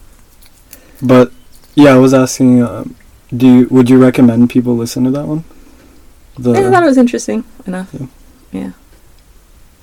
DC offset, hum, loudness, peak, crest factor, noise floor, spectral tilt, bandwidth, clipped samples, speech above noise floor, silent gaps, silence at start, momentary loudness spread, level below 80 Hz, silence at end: under 0.1%; none; -10 LUFS; 0 dBFS; 12 dB; -42 dBFS; -6.5 dB/octave; 15 kHz; 0.5%; 33 dB; none; 1 s; 19 LU; -42 dBFS; 1.1 s